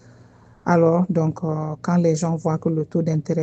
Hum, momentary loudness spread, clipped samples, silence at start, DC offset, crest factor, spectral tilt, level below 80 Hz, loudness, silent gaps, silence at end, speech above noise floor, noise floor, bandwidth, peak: none; 8 LU; under 0.1%; 0.65 s; under 0.1%; 18 dB; -8 dB/octave; -60 dBFS; -21 LUFS; none; 0 s; 29 dB; -49 dBFS; 8.4 kHz; -4 dBFS